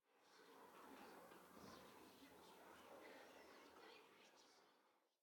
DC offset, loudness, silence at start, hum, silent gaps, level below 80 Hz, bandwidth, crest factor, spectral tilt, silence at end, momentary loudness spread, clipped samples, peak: under 0.1%; -65 LUFS; 0.05 s; none; none; under -90 dBFS; 18 kHz; 16 dB; -3 dB/octave; 0.1 s; 4 LU; under 0.1%; -50 dBFS